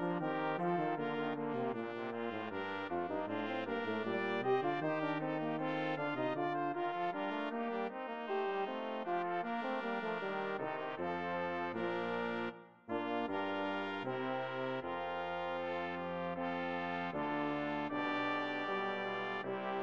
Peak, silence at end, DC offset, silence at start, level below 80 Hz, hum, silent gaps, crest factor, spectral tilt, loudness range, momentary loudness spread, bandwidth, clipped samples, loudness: -22 dBFS; 0 s; under 0.1%; 0 s; -78 dBFS; none; none; 16 dB; -7 dB/octave; 2 LU; 4 LU; 7.4 kHz; under 0.1%; -38 LUFS